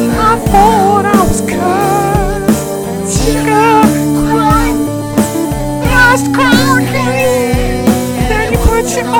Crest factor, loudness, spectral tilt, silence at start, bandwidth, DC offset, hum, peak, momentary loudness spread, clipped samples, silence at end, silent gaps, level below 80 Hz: 10 dB; -10 LUFS; -5 dB/octave; 0 s; 19.5 kHz; under 0.1%; none; 0 dBFS; 6 LU; 0.9%; 0 s; none; -22 dBFS